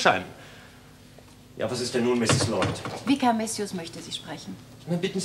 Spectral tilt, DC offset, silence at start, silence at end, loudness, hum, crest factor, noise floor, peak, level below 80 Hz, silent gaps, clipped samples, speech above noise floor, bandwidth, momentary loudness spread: -4.5 dB/octave; under 0.1%; 0 s; 0 s; -27 LUFS; none; 22 dB; -50 dBFS; -4 dBFS; -58 dBFS; none; under 0.1%; 24 dB; 15 kHz; 19 LU